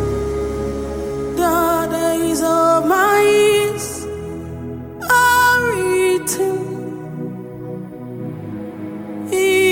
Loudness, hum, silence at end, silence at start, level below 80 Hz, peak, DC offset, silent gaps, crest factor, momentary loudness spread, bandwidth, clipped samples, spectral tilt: -16 LUFS; none; 0 s; 0 s; -40 dBFS; -2 dBFS; under 0.1%; none; 14 dB; 17 LU; 17 kHz; under 0.1%; -4 dB/octave